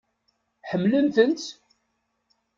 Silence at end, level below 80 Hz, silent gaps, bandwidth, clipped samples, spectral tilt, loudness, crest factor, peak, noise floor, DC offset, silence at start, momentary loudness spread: 1.05 s; -70 dBFS; none; 7.6 kHz; under 0.1%; -6 dB/octave; -23 LUFS; 20 dB; -6 dBFS; -75 dBFS; under 0.1%; 0.65 s; 17 LU